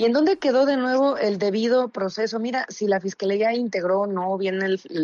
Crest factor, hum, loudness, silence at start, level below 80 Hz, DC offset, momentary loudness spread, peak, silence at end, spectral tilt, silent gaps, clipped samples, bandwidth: 12 dB; none; -22 LUFS; 0 s; -72 dBFS; under 0.1%; 6 LU; -10 dBFS; 0 s; -5.5 dB/octave; none; under 0.1%; 7.4 kHz